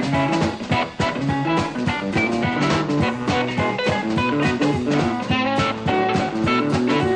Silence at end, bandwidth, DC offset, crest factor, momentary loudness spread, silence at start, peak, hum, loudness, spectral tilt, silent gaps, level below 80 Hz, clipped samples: 0 s; 9.8 kHz; under 0.1%; 12 dB; 3 LU; 0 s; -8 dBFS; none; -21 LUFS; -6 dB/octave; none; -44 dBFS; under 0.1%